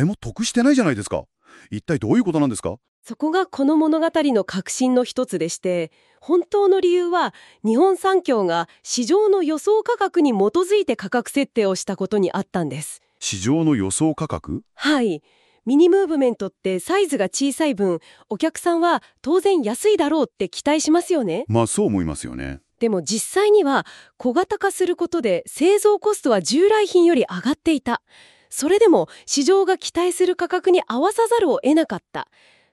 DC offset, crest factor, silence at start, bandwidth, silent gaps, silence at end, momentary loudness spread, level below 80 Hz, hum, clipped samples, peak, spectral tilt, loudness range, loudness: under 0.1%; 16 dB; 0 s; 13.5 kHz; 2.88-3.02 s; 0.5 s; 11 LU; -52 dBFS; none; under 0.1%; -4 dBFS; -4.5 dB/octave; 3 LU; -20 LUFS